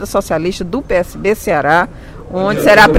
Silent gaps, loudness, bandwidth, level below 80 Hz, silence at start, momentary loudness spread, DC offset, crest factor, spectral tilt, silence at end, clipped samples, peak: none; -14 LUFS; 16.5 kHz; -34 dBFS; 0 s; 12 LU; under 0.1%; 12 dB; -5 dB/octave; 0 s; 0.4%; 0 dBFS